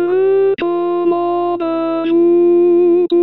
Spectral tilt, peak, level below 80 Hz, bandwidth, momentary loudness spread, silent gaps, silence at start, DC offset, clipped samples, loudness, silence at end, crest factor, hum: -9.5 dB/octave; -4 dBFS; -60 dBFS; 4.2 kHz; 6 LU; none; 0 s; 0.5%; under 0.1%; -14 LUFS; 0 s; 8 dB; none